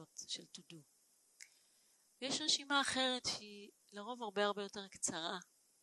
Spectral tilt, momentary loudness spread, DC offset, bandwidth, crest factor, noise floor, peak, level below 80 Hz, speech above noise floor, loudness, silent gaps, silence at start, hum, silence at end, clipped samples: -1.5 dB/octave; 25 LU; under 0.1%; 12 kHz; 24 dB; -73 dBFS; -20 dBFS; -80 dBFS; 32 dB; -39 LUFS; none; 0 s; none; 0.4 s; under 0.1%